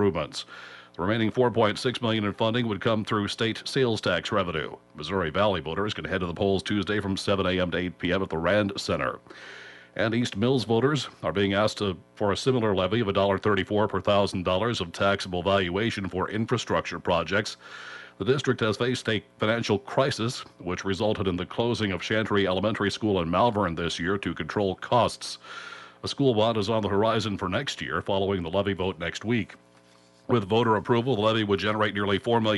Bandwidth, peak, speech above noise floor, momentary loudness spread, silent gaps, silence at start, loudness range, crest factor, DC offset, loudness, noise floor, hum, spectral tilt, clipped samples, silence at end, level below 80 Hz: 11.5 kHz; -10 dBFS; 31 dB; 8 LU; none; 0 s; 2 LU; 16 dB; under 0.1%; -26 LUFS; -57 dBFS; 60 Hz at -55 dBFS; -5.5 dB/octave; under 0.1%; 0 s; -56 dBFS